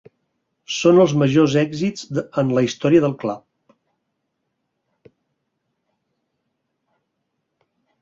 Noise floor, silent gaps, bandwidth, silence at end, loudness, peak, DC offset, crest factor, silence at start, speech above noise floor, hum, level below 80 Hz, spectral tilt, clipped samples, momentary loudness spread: -75 dBFS; none; 7.8 kHz; 4.65 s; -18 LUFS; -2 dBFS; under 0.1%; 20 dB; 0.7 s; 58 dB; none; -60 dBFS; -6.5 dB/octave; under 0.1%; 13 LU